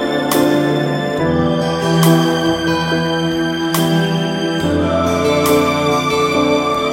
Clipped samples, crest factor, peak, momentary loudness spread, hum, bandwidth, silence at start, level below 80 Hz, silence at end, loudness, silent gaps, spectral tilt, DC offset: under 0.1%; 14 dB; 0 dBFS; 4 LU; none; 16.5 kHz; 0 s; -42 dBFS; 0 s; -15 LUFS; none; -5.5 dB/octave; under 0.1%